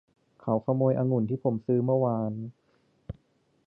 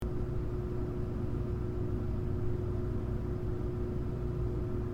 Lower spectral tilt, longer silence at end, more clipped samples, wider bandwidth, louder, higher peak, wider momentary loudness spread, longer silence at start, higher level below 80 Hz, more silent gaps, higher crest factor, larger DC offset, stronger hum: first, -13.5 dB/octave vs -10 dB/octave; first, 0.55 s vs 0 s; neither; second, 2.8 kHz vs 7.2 kHz; first, -27 LUFS vs -36 LUFS; first, -12 dBFS vs -22 dBFS; first, 20 LU vs 1 LU; first, 0.45 s vs 0 s; second, -60 dBFS vs -40 dBFS; neither; first, 18 dB vs 12 dB; neither; second, none vs 60 Hz at -40 dBFS